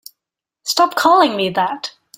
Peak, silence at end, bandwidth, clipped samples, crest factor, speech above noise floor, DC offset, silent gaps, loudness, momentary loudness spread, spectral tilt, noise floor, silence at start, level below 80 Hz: 0 dBFS; 0.3 s; 17 kHz; under 0.1%; 16 dB; 69 dB; under 0.1%; none; -15 LUFS; 13 LU; -3 dB/octave; -84 dBFS; 0.65 s; -64 dBFS